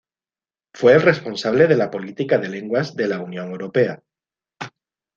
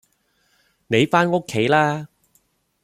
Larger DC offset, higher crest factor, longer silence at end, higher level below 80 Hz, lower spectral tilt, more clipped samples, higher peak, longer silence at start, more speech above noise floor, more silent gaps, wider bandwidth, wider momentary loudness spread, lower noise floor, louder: neither; about the same, 20 dB vs 20 dB; second, 0.5 s vs 0.8 s; about the same, -62 dBFS vs -60 dBFS; about the same, -6.5 dB/octave vs -5.5 dB/octave; neither; about the same, 0 dBFS vs -2 dBFS; second, 0.75 s vs 0.9 s; first, over 72 dB vs 47 dB; neither; second, 7.4 kHz vs 15 kHz; first, 21 LU vs 10 LU; first, under -90 dBFS vs -65 dBFS; about the same, -19 LUFS vs -19 LUFS